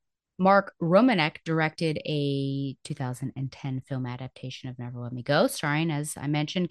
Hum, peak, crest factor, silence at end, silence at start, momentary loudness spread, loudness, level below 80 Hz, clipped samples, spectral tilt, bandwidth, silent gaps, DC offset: none; -6 dBFS; 20 dB; 0 s; 0.4 s; 15 LU; -27 LUFS; -66 dBFS; under 0.1%; -6 dB/octave; 12.5 kHz; none; under 0.1%